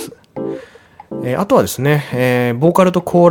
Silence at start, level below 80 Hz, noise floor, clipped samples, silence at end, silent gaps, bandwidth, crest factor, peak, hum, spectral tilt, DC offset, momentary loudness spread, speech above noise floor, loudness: 0 s; -52 dBFS; -41 dBFS; under 0.1%; 0 s; none; 18 kHz; 14 dB; 0 dBFS; none; -6.5 dB/octave; under 0.1%; 16 LU; 28 dB; -15 LUFS